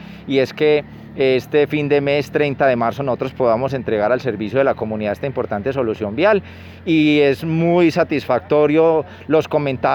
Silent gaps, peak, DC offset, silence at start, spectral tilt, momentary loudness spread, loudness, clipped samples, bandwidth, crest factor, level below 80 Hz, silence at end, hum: none; -4 dBFS; under 0.1%; 0 s; -7.5 dB/octave; 7 LU; -17 LUFS; under 0.1%; 18 kHz; 14 dB; -50 dBFS; 0 s; none